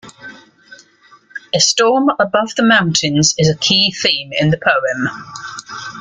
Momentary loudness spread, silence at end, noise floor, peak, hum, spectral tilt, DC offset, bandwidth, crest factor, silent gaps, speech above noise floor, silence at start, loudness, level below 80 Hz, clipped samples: 17 LU; 0 s; -48 dBFS; 0 dBFS; none; -3 dB/octave; under 0.1%; 9.6 kHz; 16 dB; none; 34 dB; 0.05 s; -13 LUFS; -52 dBFS; under 0.1%